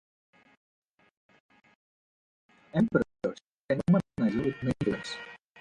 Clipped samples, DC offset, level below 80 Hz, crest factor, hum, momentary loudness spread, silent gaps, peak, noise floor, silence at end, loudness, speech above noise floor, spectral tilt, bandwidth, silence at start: under 0.1%; under 0.1%; -60 dBFS; 22 dB; none; 13 LU; 3.47-3.69 s; -10 dBFS; under -90 dBFS; 0.25 s; -30 LUFS; over 63 dB; -7.5 dB/octave; 10.5 kHz; 2.75 s